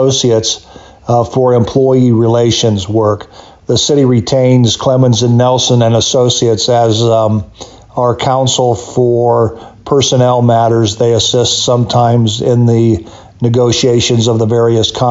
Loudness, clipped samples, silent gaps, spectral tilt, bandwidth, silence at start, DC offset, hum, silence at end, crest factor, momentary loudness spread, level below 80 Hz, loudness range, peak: -10 LUFS; under 0.1%; none; -5.5 dB/octave; 8 kHz; 0 s; under 0.1%; none; 0 s; 10 dB; 6 LU; -42 dBFS; 2 LU; 0 dBFS